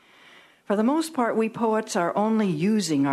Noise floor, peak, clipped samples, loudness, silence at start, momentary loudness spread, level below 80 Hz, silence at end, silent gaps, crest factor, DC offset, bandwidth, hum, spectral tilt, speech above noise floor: -53 dBFS; -10 dBFS; under 0.1%; -24 LUFS; 0.7 s; 2 LU; -74 dBFS; 0 s; none; 14 dB; under 0.1%; 13 kHz; none; -5.5 dB/octave; 30 dB